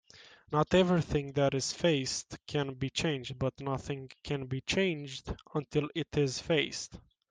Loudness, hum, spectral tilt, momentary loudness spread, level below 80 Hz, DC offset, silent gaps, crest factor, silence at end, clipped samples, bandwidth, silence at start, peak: -32 LUFS; none; -5 dB/octave; 11 LU; -56 dBFS; under 0.1%; none; 20 dB; 0.3 s; under 0.1%; 10 kHz; 0.15 s; -14 dBFS